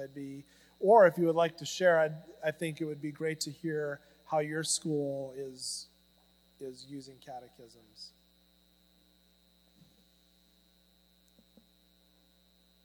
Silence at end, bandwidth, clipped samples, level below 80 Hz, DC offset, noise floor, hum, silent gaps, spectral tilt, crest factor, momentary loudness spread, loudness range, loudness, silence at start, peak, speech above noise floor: 4.75 s; 19.5 kHz; under 0.1%; -74 dBFS; under 0.1%; -67 dBFS; none; none; -4 dB/octave; 24 dB; 23 LU; 22 LU; -31 LUFS; 0 s; -10 dBFS; 35 dB